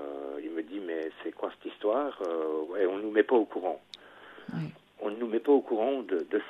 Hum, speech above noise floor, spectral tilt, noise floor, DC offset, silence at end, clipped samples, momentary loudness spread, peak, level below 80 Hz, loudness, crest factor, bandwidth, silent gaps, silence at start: 50 Hz at -75 dBFS; 22 dB; -7.5 dB/octave; -51 dBFS; under 0.1%; 0 s; under 0.1%; 15 LU; -10 dBFS; -78 dBFS; -31 LUFS; 22 dB; 6.2 kHz; none; 0 s